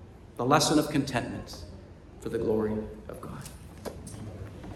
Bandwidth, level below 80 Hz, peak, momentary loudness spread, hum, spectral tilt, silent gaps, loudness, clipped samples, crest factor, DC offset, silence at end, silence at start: 14 kHz; -50 dBFS; -8 dBFS; 20 LU; none; -4.5 dB/octave; none; -28 LUFS; under 0.1%; 22 dB; under 0.1%; 0 s; 0 s